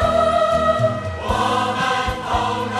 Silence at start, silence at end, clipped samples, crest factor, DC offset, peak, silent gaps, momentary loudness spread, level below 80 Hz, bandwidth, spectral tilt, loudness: 0 s; 0 s; under 0.1%; 14 dB; under 0.1%; -6 dBFS; none; 5 LU; -36 dBFS; 13.5 kHz; -5 dB/octave; -19 LUFS